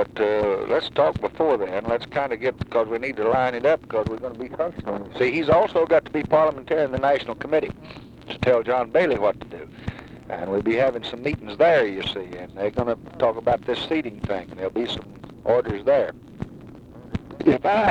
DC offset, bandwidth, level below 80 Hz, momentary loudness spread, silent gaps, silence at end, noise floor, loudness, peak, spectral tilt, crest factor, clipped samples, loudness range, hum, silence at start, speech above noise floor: under 0.1%; 9 kHz; -48 dBFS; 16 LU; none; 0 s; -42 dBFS; -23 LUFS; -6 dBFS; -7 dB/octave; 18 dB; under 0.1%; 4 LU; none; 0 s; 20 dB